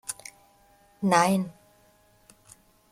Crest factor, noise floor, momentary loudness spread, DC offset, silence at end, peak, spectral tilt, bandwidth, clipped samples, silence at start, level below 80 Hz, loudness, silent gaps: 24 dB; -61 dBFS; 18 LU; under 0.1%; 1.4 s; -6 dBFS; -5 dB/octave; 16 kHz; under 0.1%; 0.1 s; -68 dBFS; -25 LUFS; none